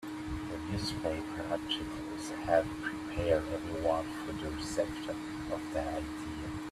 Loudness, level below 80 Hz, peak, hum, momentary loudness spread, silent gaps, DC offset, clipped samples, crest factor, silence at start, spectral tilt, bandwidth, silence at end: -36 LUFS; -50 dBFS; -14 dBFS; none; 9 LU; none; under 0.1%; under 0.1%; 22 dB; 0 s; -5 dB/octave; 14.5 kHz; 0 s